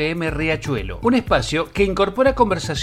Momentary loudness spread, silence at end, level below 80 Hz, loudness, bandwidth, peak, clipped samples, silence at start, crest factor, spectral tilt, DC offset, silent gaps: 5 LU; 0 s; -34 dBFS; -19 LUFS; 15 kHz; -2 dBFS; under 0.1%; 0 s; 16 dB; -5.5 dB/octave; under 0.1%; none